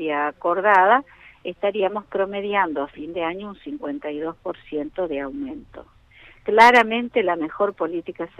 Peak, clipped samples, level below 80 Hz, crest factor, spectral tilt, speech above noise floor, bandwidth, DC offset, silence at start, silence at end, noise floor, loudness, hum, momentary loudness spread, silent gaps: -2 dBFS; under 0.1%; -56 dBFS; 20 dB; -4.5 dB/octave; 28 dB; 13 kHz; under 0.1%; 0 s; 0.15 s; -50 dBFS; -21 LUFS; none; 18 LU; none